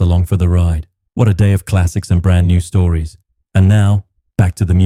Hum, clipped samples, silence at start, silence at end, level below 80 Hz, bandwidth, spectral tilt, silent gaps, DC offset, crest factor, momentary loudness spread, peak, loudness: none; under 0.1%; 0 s; 0 s; -26 dBFS; 12.5 kHz; -7.5 dB/octave; none; under 0.1%; 10 dB; 8 LU; -2 dBFS; -14 LUFS